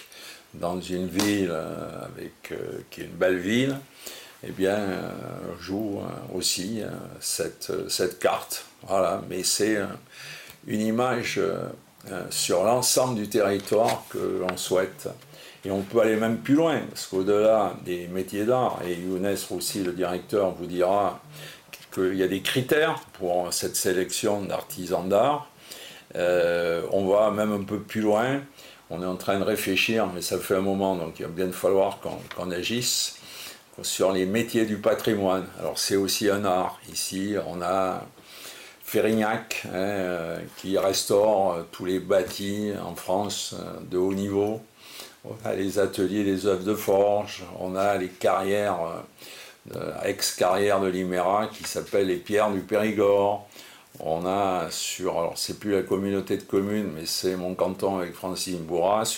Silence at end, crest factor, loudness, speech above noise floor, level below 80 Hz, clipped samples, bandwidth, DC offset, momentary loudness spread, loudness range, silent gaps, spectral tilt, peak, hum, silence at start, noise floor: 0 s; 16 dB; -26 LUFS; 20 dB; -62 dBFS; under 0.1%; 16.5 kHz; under 0.1%; 15 LU; 4 LU; none; -4 dB/octave; -10 dBFS; none; 0 s; -46 dBFS